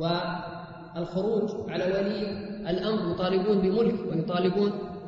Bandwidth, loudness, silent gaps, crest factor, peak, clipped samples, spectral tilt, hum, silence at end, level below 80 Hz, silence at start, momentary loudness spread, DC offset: 7.2 kHz; -28 LUFS; none; 14 dB; -12 dBFS; under 0.1%; -8 dB/octave; none; 0 s; -54 dBFS; 0 s; 11 LU; under 0.1%